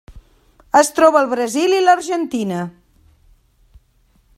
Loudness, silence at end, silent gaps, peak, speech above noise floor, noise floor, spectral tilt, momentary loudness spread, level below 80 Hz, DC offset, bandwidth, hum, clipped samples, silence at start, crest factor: -16 LUFS; 1.65 s; none; 0 dBFS; 42 dB; -57 dBFS; -4 dB/octave; 11 LU; -52 dBFS; under 0.1%; 16 kHz; none; under 0.1%; 0.1 s; 18 dB